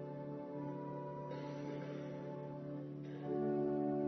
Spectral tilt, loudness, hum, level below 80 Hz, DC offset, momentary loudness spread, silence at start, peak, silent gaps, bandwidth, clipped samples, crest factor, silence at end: -8.5 dB/octave; -43 LUFS; none; -78 dBFS; under 0.1%; 9 LU; 0 s; -26 dBFS; none; 6.2 kHz; under 0.1%; 16 dB; 0 s